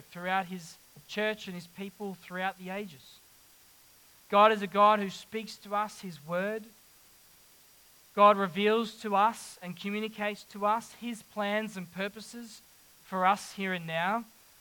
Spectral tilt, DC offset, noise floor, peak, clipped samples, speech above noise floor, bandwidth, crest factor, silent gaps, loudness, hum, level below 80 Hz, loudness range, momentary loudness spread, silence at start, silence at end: -4.5 dB/octave; under 0.1%; -59 dBFS; -10 dBFS; under 0.1%; 29 dB; 19 kHz; 22 dB; none; -30 LUFS; none; -76 dBFS; 9 LU; 19 LU; 0.1 s; 0.35 s